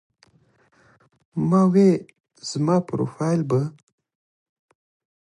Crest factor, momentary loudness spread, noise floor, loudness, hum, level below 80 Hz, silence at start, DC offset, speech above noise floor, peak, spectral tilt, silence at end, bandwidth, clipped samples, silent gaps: 18 dB; 15 LU; -61 dBFS; -21 LUFS; none; -64 dBFS; 1.35 s; under 0.1%; 41 dB; -6 dBFS; -7.5 dB/octave; 1.6 s; 11 kHz; under 0.1%; 2.20-2.24 s